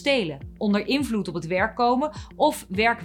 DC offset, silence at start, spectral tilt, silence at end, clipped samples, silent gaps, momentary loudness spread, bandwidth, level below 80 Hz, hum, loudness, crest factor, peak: under 0.1%; 0 s; -5 dB/octave; 0 s; under 0.1%; none; 6 LU; 18 kHz; -48 dBFS; none; -24 LUFS; 16 dB; -8 dBFS